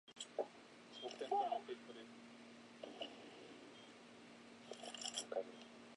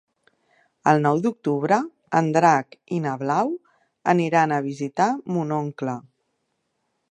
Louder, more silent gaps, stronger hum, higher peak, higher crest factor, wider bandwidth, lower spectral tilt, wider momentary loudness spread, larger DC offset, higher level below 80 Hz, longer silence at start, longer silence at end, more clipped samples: second, -48 LUFS vs -22 LUFS; neither; neither; second, -28 dBFS vs -2 dBFS; about the same, 22 dB vs 22 dB; first, 11 kHz vs 9.6 kHz; second, -2 dB/octave vs -6.5 dB/octave; first, 17 LU vs 10 LU; neither; second, under -90 dBFS vs -74 dBFS; second, 0.05 s vs 0.85 s; second, 0 s vs 1.1 s; neither